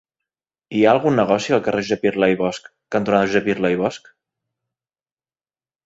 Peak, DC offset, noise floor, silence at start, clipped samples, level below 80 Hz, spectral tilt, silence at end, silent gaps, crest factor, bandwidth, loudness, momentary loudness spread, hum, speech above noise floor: -2 dBFS; under 0.1%; under -90 dBFS; 0.7 s; under 0.1%; -58 dBFS; -6 dB/octave; 1.9 s; none; 20 dB; 8 kHz; -19 LUFS; 9 LU; none; over 72 dB